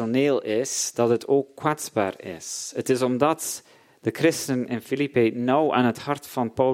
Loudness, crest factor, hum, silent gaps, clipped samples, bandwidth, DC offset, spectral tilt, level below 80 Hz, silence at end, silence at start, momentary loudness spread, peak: -24 LUFS; 18 dB; none; none; under 0.1%; 16.5 kHz; under 0.1%; -4.5 dB/octave; -68 dBFS; 0 s; 0 s; 9 LU; -4 dBFS